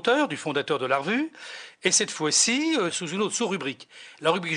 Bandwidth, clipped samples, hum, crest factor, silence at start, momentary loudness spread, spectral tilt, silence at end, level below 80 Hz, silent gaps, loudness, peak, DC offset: 10 kHz; under 0.1%; none; 16 dB; 0.05 s; 13 LU; -2 dB/octave; 0 s; -74 dBFS; none; -24 LUFS; -10 dBFS; under 0.1%